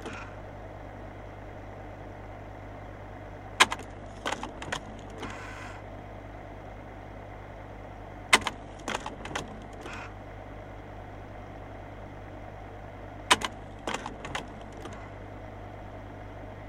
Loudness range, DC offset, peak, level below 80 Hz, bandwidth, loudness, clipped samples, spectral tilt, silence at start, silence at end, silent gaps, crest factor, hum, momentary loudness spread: 11 LU; under 0.1%; -4 dBFS; -50 dBFS; 16 kHz; -35 LUFS; under 0.1%; -2.5 dB/octave; 0 s; 0 s; none; 32 dB; 50 Hz at -45 dBFS; 19 LU